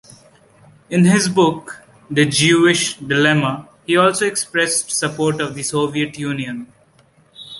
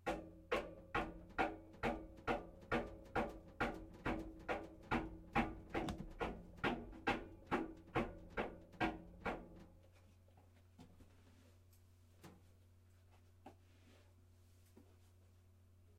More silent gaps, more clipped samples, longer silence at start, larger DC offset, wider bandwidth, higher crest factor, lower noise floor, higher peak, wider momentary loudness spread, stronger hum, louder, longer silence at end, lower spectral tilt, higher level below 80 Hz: neither; neither; first, 0.9 s vs 0 s; neither; second, 12 kHz vs 16 kHz; about the same, 18 dB vs 22 dB; second, -54 dBFS vs -67 dBFS; first, -2 dBFS vs -24 dBFS; second, 12 LU vs 21 LU; neither; first, -16 LUFS vs -45 LUFS; about the same, 0 s vs 0 s; second, -4 dB/octave vs -6 dB/octave; about the same, -56 dBFS vs -58 dBFS